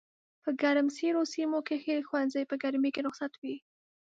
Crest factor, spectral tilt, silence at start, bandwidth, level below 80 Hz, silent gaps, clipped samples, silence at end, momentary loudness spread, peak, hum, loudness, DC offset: 16 dB; -3.5 dB/octave; 0.45 s; 7.8 kHz; -84 dBFS; 3.38-3.42 s; under 0.1%; 0.45 s; 11 LU; -16 dBFS; none; -32 LUFS; under 0.1%